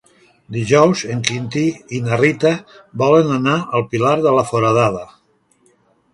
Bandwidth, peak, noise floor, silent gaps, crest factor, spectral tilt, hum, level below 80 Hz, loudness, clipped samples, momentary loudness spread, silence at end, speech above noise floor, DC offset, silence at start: 11.5 kHz; 0 dBFS; -58 dBFS; none; 18 dB; -5.5 dB/octave; none; -54 dBFS; -16 LUFS; under 0.1%; 11 LU; 1.1 s; 42 dB; under 0.1%; 0.5 s